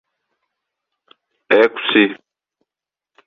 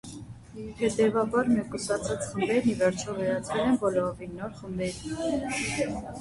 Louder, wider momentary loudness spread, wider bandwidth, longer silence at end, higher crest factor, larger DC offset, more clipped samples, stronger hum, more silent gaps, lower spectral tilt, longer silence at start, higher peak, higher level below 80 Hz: first, -15 LUFS vs -28 LUFS; second, 7 LU vs 13 LU; second, 6.2 kHz vs 11.5 kHz; first, 1.15 s vs 0 s; about the same, 20 dB vs 18 dB; neither; neither; neither; neither; about the same, -6 dB/octave vs -5 dB/octave; first, 1.5 s vs 0.05 s; first, -2 dBFS vs -10 dBFS; second, -70 dBFS vs -52 dBFS